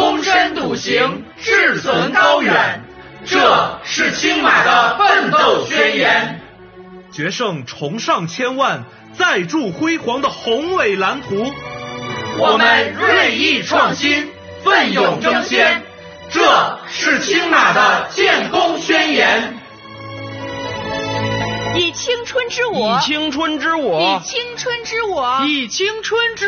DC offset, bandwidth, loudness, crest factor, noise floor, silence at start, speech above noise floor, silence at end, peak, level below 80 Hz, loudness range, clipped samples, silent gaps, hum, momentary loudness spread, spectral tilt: under 0.1%; 6.8 kHz; -15 LUFS; 16 dB; -38 dBFS; 0 s; 23 dB; 0 s; 0 dBFS; -50 dBFS; 5 LU; under 0.1%; none; none; 13 LU; -1 dB/octave